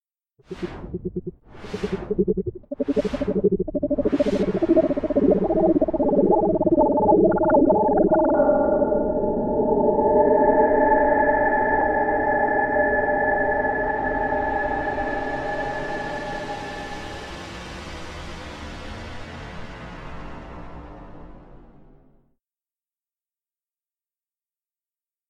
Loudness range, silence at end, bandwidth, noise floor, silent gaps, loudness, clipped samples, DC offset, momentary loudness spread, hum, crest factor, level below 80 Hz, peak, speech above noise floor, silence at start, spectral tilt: 18 LU; 3.75 s; 9.2 kHz; under -90 dBFS; none; -21 LUFS; under 0.1%; under 0.1%; 19 LU; none; 16 dB; -40 dBFS; -6 dBFS; over 65 dB; 0.5 s; -7.5 dB/octave